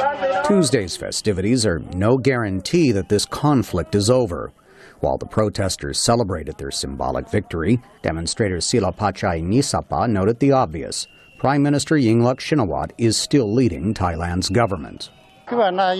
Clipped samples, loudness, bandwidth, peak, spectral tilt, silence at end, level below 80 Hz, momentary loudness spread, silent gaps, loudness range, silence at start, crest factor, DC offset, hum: under 0.1%; -20 LUFS; 13.5 kHz; -4 dBFS; -5 dB/octave; 0 s; -42 dBFS; 9 LU; none; 3 LU; 0 s; 16 dB; under 0.1%; none